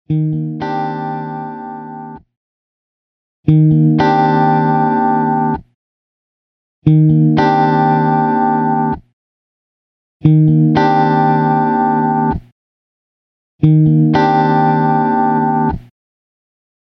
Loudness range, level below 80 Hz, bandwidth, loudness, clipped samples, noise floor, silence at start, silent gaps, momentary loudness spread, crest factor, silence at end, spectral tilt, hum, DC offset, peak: 2 LU; -42 dBFS; 6 kHz; -13 LUFS; under 0.1%; under -90 dBFS; 0.1 s; 2.37-3.43 s, 5.75-6.82 s, 9.13-10.20 s, 12.52-13.59 s; 14 LU; 14 dB; 1.15 s; -10 dB/octave; none; under 0.1%; 0 dBFS